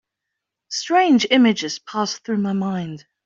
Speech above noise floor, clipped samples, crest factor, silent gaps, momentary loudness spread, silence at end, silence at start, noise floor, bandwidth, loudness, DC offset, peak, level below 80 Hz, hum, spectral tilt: 62 dB; under 0.1%; 18 dB; none; 13 LU; 0.25 s; 0.7 s; -82 dBFS; 7.6 kHz; -19 LUFS; under 0.1%; -2 dBFS; -66 dBFS; none; -4.5 dB/octave